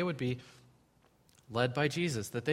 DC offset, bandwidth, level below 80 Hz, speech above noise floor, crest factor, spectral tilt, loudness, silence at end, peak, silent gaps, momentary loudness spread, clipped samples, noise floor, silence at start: under 0.1%; 16 kHz; -68 dBFS; 34 dB; 22 dB; -5.5 dB/octave; -34 LUFS; 0 s; -14 dBFS; none; 8 LU; under 0.1%; -68 dBFS; 0 s